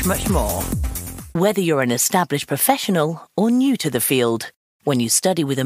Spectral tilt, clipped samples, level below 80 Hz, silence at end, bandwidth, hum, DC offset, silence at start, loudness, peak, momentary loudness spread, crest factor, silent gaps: -4 dB/octave; under 0.1%; -34 dBFS; 0 s; 16 kHz; none; under 0.1%; 0 s; -19 LUFS; -2 dBFS; 10 LU; 18 dB; 4.56-4.80 s